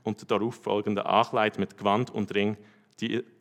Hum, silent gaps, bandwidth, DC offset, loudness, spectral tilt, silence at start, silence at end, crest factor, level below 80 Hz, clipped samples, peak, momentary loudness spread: none; none; 11 kHz; under 0.1%; -28 LUFS; -6 dB/octave; 0.05 s; 0.15 s; 20 dB; -78 dBFS; under 0.1%; -8 dBFS; 7 LU